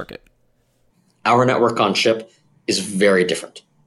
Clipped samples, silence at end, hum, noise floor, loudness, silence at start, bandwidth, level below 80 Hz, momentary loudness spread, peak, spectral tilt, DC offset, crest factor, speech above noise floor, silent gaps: under 0.1%; 0.3 s; none; -62 dBFS; -18 LUFS; 0 s; 14.5 kHz; -62 dBFS; 13 LU; -4 dBFS; -4 dB/octave; under 0.1%; 16 dB; 44 dB; none